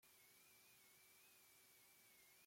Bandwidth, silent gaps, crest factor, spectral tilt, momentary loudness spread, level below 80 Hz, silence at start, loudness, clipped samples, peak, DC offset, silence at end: 16.5 kHz; none; 12 dB; -0.5 dB/octave; 0 LU; under -90 dBFS; 0 s; -68 LUFS; under 0.1%; -58 dBFS; under 0.1%; 0 s